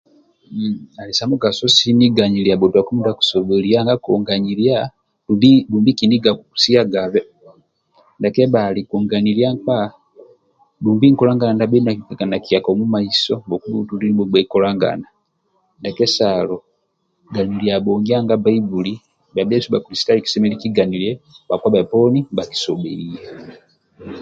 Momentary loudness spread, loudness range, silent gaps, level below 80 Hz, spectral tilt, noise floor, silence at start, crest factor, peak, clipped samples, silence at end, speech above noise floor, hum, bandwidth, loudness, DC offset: 11 LU; 4 LU; none; -54 dBFS; -6 dB/octave; -67 dBFS; 0.5 s; 16 dB; 0 dBFS; under 0.1%; 0 s; 51 dB; none; 7.8 kHz; -16 LUFS; under 0.1%